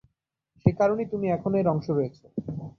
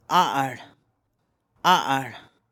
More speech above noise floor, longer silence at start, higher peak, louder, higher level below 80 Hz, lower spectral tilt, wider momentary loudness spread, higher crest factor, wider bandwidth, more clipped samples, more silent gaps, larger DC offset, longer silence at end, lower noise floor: about the same, 50 dB vs 51 dB; first, 0.65 s vs 0.1 s; about the same, -6 dBFS vs -6 dBFS; second, -26 LUFS vs -23 LUFS; first, -52 dBFS vs -72 dBFS; first, -10 dB/octave vs -3.5 dB/octave; second, 11 LU vs 15 LU; about the same, 20 dB vs 20 dB; second, 6.4 kHz vs 18 kHz; neither; neither; neither; second, 0.1 s vs 0.3 s; about the same, -76 dBFS vs -73 dBFS